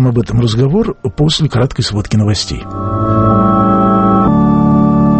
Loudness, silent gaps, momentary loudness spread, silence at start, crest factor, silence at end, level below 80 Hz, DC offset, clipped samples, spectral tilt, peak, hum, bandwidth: -12 LUFS; none; 7 LU; 0 s; 10 dB; 0 s; -28 dBFS; under 0.1%; under 0.1%; -7 dB/octave; 0 dBFS; none; 8.8 kHz